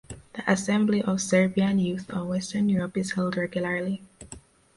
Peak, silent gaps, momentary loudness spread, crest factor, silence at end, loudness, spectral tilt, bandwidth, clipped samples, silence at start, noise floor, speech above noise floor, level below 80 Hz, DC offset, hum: -8 dBFS; none; 16 LU; 18 dB; 0.4 s; -26 LUFS; -5.5 dB/octave; 11.5 kHz; under 0.1%; 0.1 s; -48 dBFS; 23 dB; -58 dBFS; under 0.1%; none